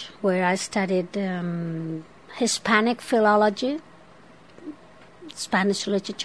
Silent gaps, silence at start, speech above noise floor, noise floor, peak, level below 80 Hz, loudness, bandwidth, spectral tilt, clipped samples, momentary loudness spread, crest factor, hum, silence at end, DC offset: none; 0 s; 27 dB; -51 dBFS; -6 dBFS; -66 dBFS; -24 LUFS; 11 kHz; -4.5 dB/octave; under 0.1%; 21 LU; 20 dB; none; 0 s; 0.2%